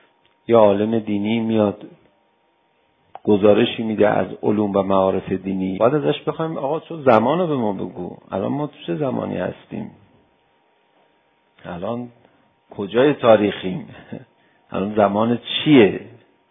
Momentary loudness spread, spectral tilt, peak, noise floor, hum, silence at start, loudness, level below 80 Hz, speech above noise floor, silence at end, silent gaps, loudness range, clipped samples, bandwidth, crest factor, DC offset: 18 LU; -9.5 dB/octave; 0 dBFS; -63 dBFS; none; 0.5 s; -19 LUFS; -54 dBFS; 44 dB; 0.4 s; none; 11 LU; under 0.1%; 4.5 kHz; 20 dB; under 0.1%